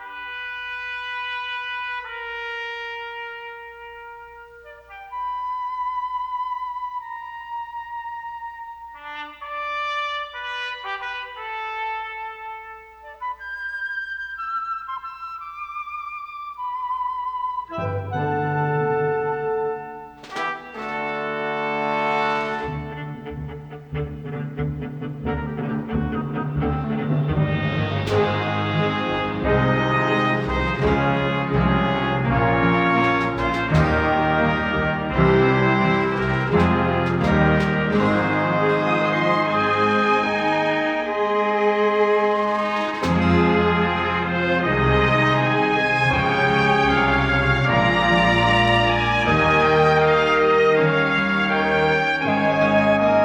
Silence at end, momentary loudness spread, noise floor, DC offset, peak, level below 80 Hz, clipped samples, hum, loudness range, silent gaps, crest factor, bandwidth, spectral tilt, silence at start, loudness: 0 s; 15 LU; -43 dBFS; under 0.1%; -4 dBFS; -38 dBFS; under 0.1%; none; 12 LU; none; 18 dB; 9.6 kHz; -7 dB/octave; 0 s; -21 LUFS